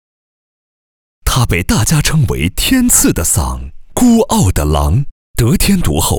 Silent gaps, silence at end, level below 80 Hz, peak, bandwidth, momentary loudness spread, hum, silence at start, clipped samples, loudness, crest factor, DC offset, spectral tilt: 5.11-5.34 s; 0 s; -22 dBFS; 0 dBFS; over 20 kHz; 9 LU; none; 1.25 s; under 0.1%; -12 LUFS; 12 dB; under 0.1%; -4.5 dB/octave